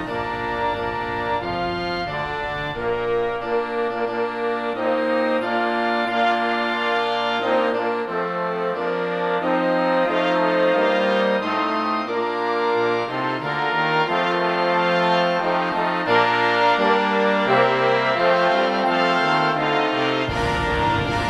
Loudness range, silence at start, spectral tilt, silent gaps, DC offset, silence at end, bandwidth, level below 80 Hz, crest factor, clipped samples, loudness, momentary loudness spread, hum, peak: 6 LU; 0 s; -5.5 dB/octave; none; under 0.1%; 0 s; 12 kHz; -46 dBFS; 18 dB; under 0.1%; -21 LUFS; 6 LU; none; -4 dBFS